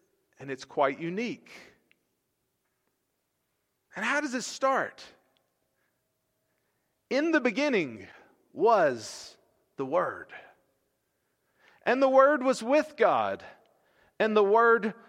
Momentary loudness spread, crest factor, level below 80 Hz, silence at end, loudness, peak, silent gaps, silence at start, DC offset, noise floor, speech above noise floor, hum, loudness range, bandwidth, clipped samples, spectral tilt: 19 LU; 22 dB; -82 dBFS; 0.15 s; -26 LUFS; -8 dBFS; none; 0.4 s; under 0.1%; -79 dBFS; 52 dB; none; 10 LU; 12.5 kHz; under 0.1%; -4.5 dB/octave